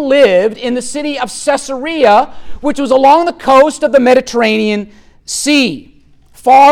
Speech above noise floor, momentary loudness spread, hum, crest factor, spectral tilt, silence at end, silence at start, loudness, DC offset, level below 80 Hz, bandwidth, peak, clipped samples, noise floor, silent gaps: 31 dB; 11 LU; none; 10 dB; -3.5 dB/octave; 0 s; 0 s; -11 LUFS; under 0.1%; -42 dBFS; 15 kHz; 0 dBFS; under 0.1%; -42 dBFS; none